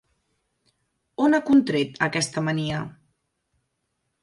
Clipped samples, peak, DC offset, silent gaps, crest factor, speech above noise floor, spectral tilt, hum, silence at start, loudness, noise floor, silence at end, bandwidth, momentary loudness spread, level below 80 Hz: under 0.1%; -6 dBFS; under 0.1%; none; 20 dB; 54 dB; -5 dB/octave; none; 1.2 s; -23 LUFS; -76 dBFS; 1.3 s; 11.5 kHz; 13 LU; -62 dBFS